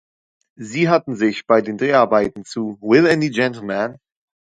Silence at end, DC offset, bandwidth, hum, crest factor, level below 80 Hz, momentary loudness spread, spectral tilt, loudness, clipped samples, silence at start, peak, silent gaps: 0.55 s; under 0.1%; 10 kHz; none; 18 dB; -58 dBFS; 12 LU; -6 dB/octave; -18 LUFS; under 0.1%; 0.6 s; 0 dBFS; none